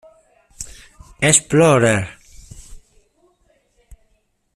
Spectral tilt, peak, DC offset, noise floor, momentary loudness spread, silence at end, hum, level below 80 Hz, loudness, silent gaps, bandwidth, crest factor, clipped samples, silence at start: -4 dB/octave; 0 dBFS; under 0.1%; -64 dBFS; 22 LU; 1.75 s; none; -46 dBFS; -14 LUFS; none; 14.5 kHz; 20 dB; under 0.1%; 0.6 s